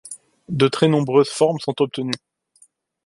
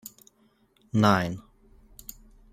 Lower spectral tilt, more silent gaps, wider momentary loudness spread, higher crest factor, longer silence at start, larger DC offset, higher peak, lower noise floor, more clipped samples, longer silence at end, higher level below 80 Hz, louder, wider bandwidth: about the same, -6 dB/octave vs -6 dB/octave; neither; second, 14 LU vs 23 LU; second, 18 dB vs 24 dB; about the same, 0.05 s vs 0.05 s; neither; about the same, -2 dBFS vs -4 dBFS; second, -57 dBFS vs -65 dBFS; neither; second, 0.9 s vs 1.1 s; second, -62 dBFS vs -56 dBFS; first, -20 LUFS vs -25 LUFS; second, 11.5 kHz vs 16 kHz